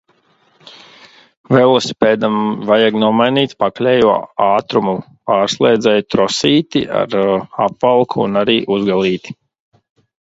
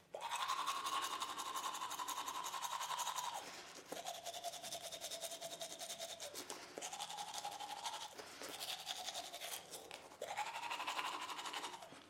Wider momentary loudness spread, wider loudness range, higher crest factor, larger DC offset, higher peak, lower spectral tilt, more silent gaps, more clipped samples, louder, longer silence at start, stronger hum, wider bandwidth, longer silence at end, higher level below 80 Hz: about the same, 6 LU vs 8 LU; about the same, 2 LU vs 4 LU; second, 14 dB vs 24 dB; neither; first, 0 dBFS vs -22 dBFS; first, -5.5 dB/octave vs 0 dB/octave; first, 1.37-1.44 s vs none; neither; first, -14 LUFS vs -45 LUFS; first, 0.65 s vs 0 s; neither; second, 8 kHz vs 16 kHz; first, 0.95 s vs 0 s; first, -54 dBFS vs -88 dBFS